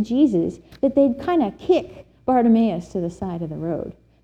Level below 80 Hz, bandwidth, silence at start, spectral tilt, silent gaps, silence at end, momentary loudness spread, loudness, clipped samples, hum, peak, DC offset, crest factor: -50 dBFS; 8.4 kHz; 0 s; -8 dB/octave; none; 0.3 s; 12 LU; -21 LUFS; under 0.1%; none; -6 dBFS; under 0.1%; 14 dB